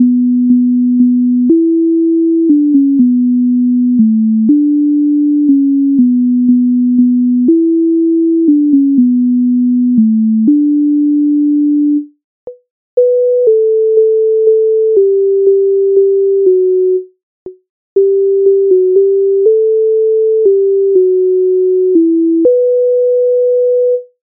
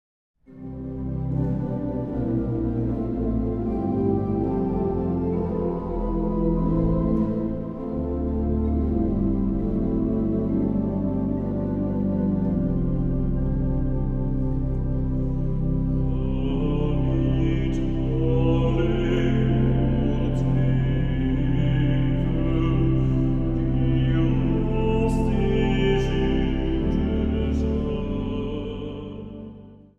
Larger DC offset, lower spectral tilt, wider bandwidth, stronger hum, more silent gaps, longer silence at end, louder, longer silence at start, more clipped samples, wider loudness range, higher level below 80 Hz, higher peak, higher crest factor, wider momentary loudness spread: neither; first, -11 dB/octave vs -9.5 dB/octave; second, 0.8 kHz vs 6.8 kHz; neither; first, 12.24-12.47 s, 12.71-12.97 s, 17.23-17.46 s, 17.69-17.96 s vs none; about the same, 0.2 s vs 0.25 s; first, -10 LUFS vs -24 LUFS; second, 0 s vs 0.5 s; neither; about the same, 2 LU vs 3 LU; second, -64 dBFS vs -28 dBFS; first, 0 dBFS vs -10 dBFS; second, 8 dB vs 14 dB; second, 1 LU vs 6 LU